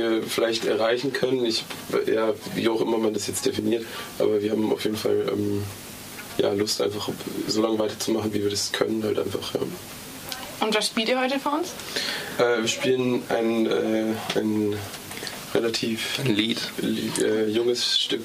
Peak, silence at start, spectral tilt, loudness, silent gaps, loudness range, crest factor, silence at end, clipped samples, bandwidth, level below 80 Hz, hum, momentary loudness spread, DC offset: -6 dBFS; 0 s; -4 dB/octave; -25 LUFS; none; 2 LU; 18 dB; 0 s; under 0.1%; 15.5 kHz; -62 dBFS; none; 8 LU; under 0.1%